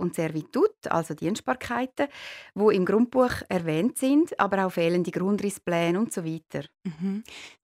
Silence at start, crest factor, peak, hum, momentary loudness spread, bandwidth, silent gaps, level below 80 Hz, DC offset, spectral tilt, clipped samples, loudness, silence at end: 0 s; 20 dB; -6 dBFS; none; 12 LU; 16 kHz; none; -60 dBFS; under 0.1%; -6 dB/octave; under 0.1%; -26 LUFS; 0.15 s